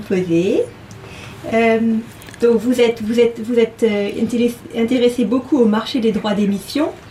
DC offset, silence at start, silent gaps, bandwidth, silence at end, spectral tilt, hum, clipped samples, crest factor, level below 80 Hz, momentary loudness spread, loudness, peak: under 0.1%; 0 s; none; 15 kHz; 0 s; -6 dB/octave; none; under 0.1%; 14 dB; -50 dBFS; 9 LU; -17 LUFS; -4 dBFS